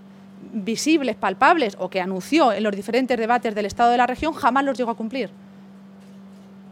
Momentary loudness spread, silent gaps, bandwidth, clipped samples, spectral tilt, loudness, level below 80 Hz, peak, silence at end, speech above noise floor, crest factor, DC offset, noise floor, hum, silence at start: 10 LU; none; 16 kHz; under 0.1%; -4.5 dB/octave; -21 LUFS; -54 dBFS; -4 dBFS; 0 s; 23 dB; 18 dB; under 0.1%; -44 dBFS; none; 0 s